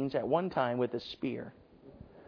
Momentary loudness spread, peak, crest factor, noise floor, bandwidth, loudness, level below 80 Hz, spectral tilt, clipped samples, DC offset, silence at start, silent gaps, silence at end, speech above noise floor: 20 LU; -16 dBFS; 20 dB; -54 dBFS; 5.4 kHz; -34 LUFS; -66 dBFS; -5 dB/octave; under 0.1%; under 0.1%; 0 s; none; 0 s; 21 dB